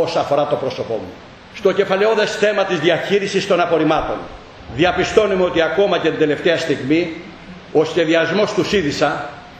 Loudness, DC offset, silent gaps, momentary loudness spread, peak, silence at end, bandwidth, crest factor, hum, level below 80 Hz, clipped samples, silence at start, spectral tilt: -17 LUFS; under 0.1%; none; 11 LU; 0 dBFS; 0 s; 9.2 kHz; 18 dB; none; -46 dBFS; under 0.1%; 0 s; -5 dB/octave